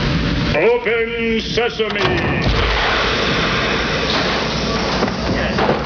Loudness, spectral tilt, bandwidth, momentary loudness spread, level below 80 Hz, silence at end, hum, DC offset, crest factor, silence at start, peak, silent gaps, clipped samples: -17 LUFS; -5 dB/octave; 5.4 kHz; 3 LU; -28 dBFS; 0 s; none; under 0.1%; 14 dB; 0 s; -2 dBFS; none; under 0.1%